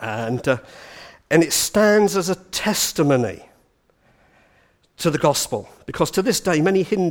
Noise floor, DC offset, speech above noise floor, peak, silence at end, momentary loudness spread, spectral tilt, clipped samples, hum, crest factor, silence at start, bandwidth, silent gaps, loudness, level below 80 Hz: -61 dBFS; under 0.1%; 41 dB; -2 dBFS; 0 s; 13 LU; -4 dB/octave; under 0.1%; none; 18 dB; 0 s; 19.5 kHz; none; -19 LUFS; -52 dBFS